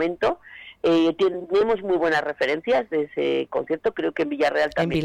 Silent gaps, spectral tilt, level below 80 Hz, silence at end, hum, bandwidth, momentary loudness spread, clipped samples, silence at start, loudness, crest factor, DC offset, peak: none; -6 dB/octave; -56 dBFS; 0 s; none; 10 kHz; 6 LU; under 0.1%; 0 s; -23 LUFS; 10 dB; under 0.1%; -12 dBFS